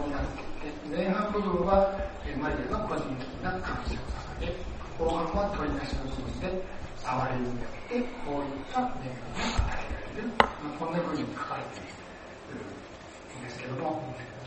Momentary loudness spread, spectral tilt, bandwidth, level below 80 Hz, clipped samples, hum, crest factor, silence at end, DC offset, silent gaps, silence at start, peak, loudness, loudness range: 15 LU; -6 dB/octave; 8.4 kHz; -40 dBFS; under 0.1%; none; 30 dB; 0 s; under 0.1%; none; 0 s; -2 dBFS; -32 LUFS; 4 LU